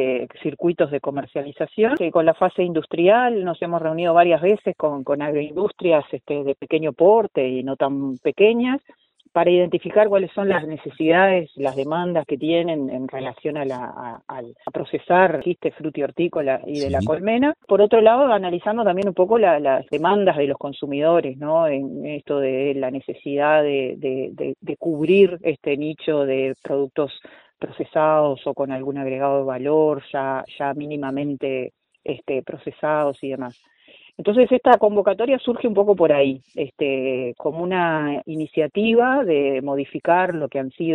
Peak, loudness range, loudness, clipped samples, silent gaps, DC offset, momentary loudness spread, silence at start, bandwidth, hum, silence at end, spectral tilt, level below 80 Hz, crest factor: 0 dBFS; 5 LU; -20 LUFS; under 0.1%; none; under 0.1%; 12 LU; 0 s; 6.6 kHz; none; 0 s; -8 dB/octave; -60 dBFS; 20 dB